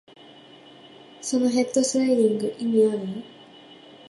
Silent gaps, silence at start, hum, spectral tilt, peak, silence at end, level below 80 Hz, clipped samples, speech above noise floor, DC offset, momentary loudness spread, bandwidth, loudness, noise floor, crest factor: none; 1.2 s; none; -4.5 dB/octave; -8 dBFS; 0.35 s; -74 dBFS; under 0.1%; 26 dB; under 0.1%; 14 LU; 11.5 kHz; -23 LUFS; -48 dBFS; 16 dB